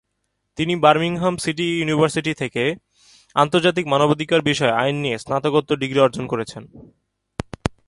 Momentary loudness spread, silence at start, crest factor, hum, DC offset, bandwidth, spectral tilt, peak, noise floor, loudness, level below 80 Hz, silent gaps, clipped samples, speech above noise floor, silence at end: 13 LU; 0.55 s; 20 dB; none; under 0.1%; 11.5 kHz; -5.5 dB/octave; 0 dBFS; -74 dBFS; -20 LUFS; -50 dBFS; none; under 0.1%; 54 dB; 0.2 s